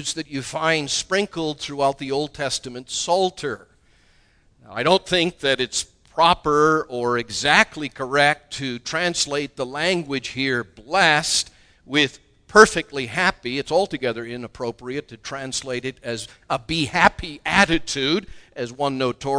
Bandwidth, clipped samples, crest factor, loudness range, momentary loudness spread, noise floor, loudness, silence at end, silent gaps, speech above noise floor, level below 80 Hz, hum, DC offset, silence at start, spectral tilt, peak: 11 kHz; under 0.1%; 22 dB; 6 LU; 14 LU; -57 dBFS; -21 LUFS; 0 s; none; 36 dB; -48 dBFS; none; under 0.1%; 0 s; -3 dB/octave; 0 dBFS